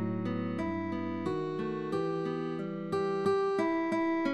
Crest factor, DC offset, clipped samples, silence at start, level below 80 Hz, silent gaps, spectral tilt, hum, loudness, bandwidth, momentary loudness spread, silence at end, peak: 14 dB; under 0.1%; under 0.1%; 0 s; -66 dBFS; none; -7.5 dB/octave; none; -33 LUFS; 11 kHz; 6 LU; 0 s; -18 dBFS